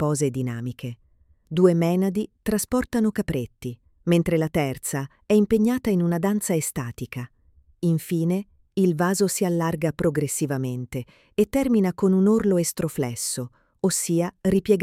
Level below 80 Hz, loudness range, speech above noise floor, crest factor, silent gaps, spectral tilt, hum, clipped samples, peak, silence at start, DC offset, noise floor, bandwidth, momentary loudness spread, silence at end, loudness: -50 dBFS; 2 LU; 32 dB; 18 dB; none; -6 dB/octave; none; under 0.1%; -6 dBFS; 0 s; under 0.1%; -55 dBFS; 16.5 kHz; 12 LU; 0 s; -23 LUFS